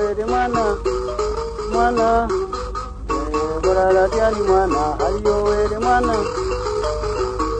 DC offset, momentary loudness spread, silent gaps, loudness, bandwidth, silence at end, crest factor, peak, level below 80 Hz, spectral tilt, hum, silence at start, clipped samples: under 0.1%; 8 LU; none; -19 LUFS; 9.4 kHz; 0 s; 14 dB; -4 dBFS; -30 dBFS; -5.5 dB/octave; 50 Hz at -30 dBFS; 0 s; under 0.1%